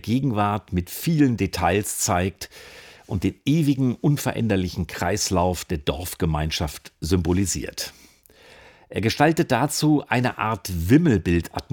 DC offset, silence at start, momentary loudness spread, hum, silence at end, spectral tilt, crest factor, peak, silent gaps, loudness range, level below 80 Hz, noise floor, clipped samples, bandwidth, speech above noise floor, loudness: under 0.1%; 0.05 s; 10 LU; none; 0.1 s; -5.5 dB/octave; 18 dB; -4 dBFS; none; 4 LU; -44 dBFS; -52 dBFS; under 0.1%; over 20 kHz; 30 dB; -23 LUFS